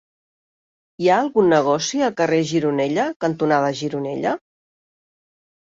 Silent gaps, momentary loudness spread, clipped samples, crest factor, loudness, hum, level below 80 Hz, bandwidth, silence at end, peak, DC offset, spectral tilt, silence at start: 3.16-3.20 s; 8 LU; under 0.1%; 18 dB; -20 LUFS; none; -64 dBFS; 7.8 kHz; 1.4 s; -4 dBFS; under 0.1%; -5 dB/octave; 1 s